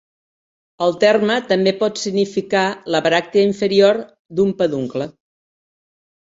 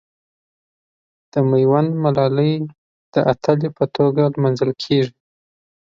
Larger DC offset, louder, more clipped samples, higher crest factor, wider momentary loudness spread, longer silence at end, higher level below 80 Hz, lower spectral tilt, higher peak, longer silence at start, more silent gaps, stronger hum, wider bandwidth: neither; about the same, -17 LUFS vs -18 LUFS; neither; about the same, 16 dB vs 18 dB; about the same, 9 LU vs 8 LU; first, 1.1 s vs 0.8 s; about the same, -60 dBFS vs -58 dBFS; second, -5 dB/octave vs -8.5 dB/octave; about the same, -2 dBFS vs -2 dBFS; second, 0.8 s vs 1.35 s; second, 4.19-4.25 s vs 2.78-3.12 s; neither; about the same, 7.8 kHz vs 7.2 kHz